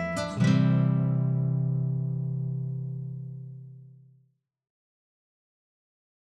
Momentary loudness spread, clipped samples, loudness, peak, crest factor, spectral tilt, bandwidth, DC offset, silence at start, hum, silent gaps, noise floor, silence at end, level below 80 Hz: 18 LU; under 0.1%; -27 LUFS; -12 dBFS; 16 dB; -8 dB/octave; 10 kHz; under 0.1%; 0 s; none; none; -68 dBFS; 2.45 s; -68 dBFS